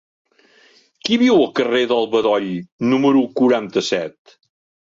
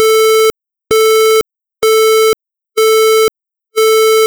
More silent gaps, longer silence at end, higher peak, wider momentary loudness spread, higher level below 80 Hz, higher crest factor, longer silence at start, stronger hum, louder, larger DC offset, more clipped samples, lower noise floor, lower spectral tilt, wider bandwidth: first, 2.72-2.79 s vs none; first, 0.75 s vs 0 s; second, -4 dBFS vs 0 dBFS; about the same, 9 LU vs 9 LU; second, -62 dBFS vs -50 dBFS; about the same, 14 dB vs 10 dB; first, 1.05 s vs 0 s; neither; second, -17 LUFS vs -10 LUFS; neither; neither; first, -53 dBFS vs -29 dBFS; first, -5 dB/octave vs -0.5 dB/octave; second, 7.6 kHz vs over 20 kHz